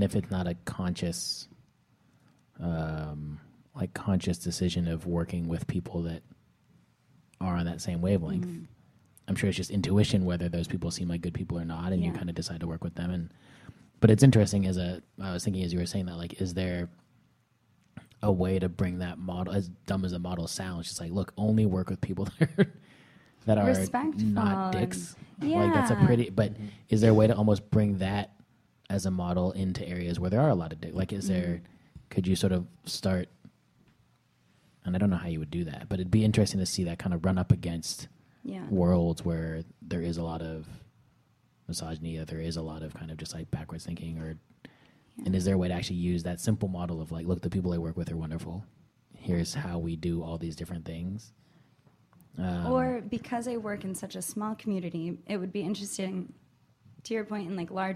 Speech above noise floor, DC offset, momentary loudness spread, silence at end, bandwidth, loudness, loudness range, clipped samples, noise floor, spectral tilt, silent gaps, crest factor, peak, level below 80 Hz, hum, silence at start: 39 dB; under 0.1%; 13 LU; 0 s; 14.5 kHz; -30 LUFS; 9 LU; under 0.1%; -68 dBFS; -6.5 dB/octave; none; 26 dB; -4 dBFS; -52 dBFS; none; 0 s